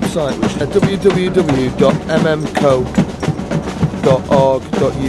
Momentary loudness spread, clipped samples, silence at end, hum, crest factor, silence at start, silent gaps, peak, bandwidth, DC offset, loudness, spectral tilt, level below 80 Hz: 6 LU; under 0.1%; 0 s; none; 14 dB; 0 s; none; 0 dBFS; 12.5 kHz; under 0.1%; -15 LUFS; -6.5 dB/octave; -34 dBFS